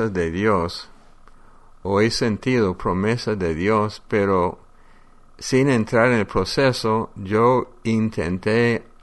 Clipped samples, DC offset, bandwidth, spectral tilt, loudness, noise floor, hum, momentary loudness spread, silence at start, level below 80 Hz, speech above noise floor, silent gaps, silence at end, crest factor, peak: under 0.1%; under 0.1%; 11.5 kHz; -6 dB/octave; -20 LUFS; -47 dBFS; none; 6 LU; 0 s; -44 dBFS; 27 dB; none; 0.2 s; 18 dB; -4 dBFS